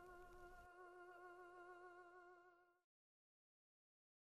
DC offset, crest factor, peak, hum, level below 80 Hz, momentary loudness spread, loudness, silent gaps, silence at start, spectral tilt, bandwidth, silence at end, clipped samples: under 0.1%; 14 dB; -52 dBFS; none; -78 dBFS; 3 LU; -63 LUFS; none; 0 s; -5 dB/octave; 13 kHz; 1.55 s; under 0.1%